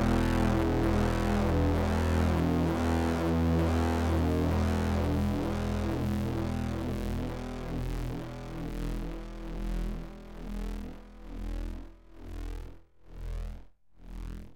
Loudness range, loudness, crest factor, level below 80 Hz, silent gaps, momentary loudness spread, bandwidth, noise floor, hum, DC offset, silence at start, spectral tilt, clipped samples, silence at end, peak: 15 LU; -31 LUFS; 14 dB; -36 dBFS; none; 17 LU; 17 kHz; -50 dBFS; none; under 0.1%; 0 s; -7 dB/octave; under 0.1%; 0 s; -16 dBFS